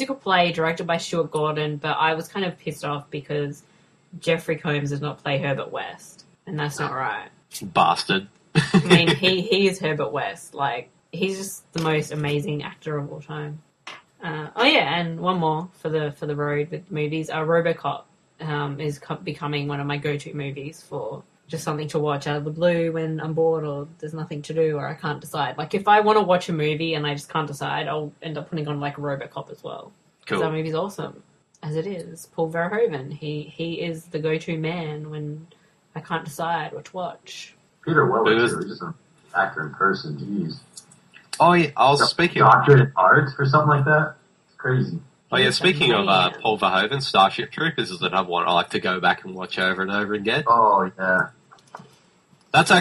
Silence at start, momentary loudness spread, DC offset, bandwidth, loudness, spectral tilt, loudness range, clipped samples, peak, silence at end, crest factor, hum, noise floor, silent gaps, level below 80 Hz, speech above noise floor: 0 s; 16 LU; under 0.1%; 13 kHz; -22 LUFS; -5.5 dB/octave; 11 LU; under 0.1%; 0 dBFS; 0 s; 22 dB; none; -58 dBFS; none; -60 dBFS; 35 dB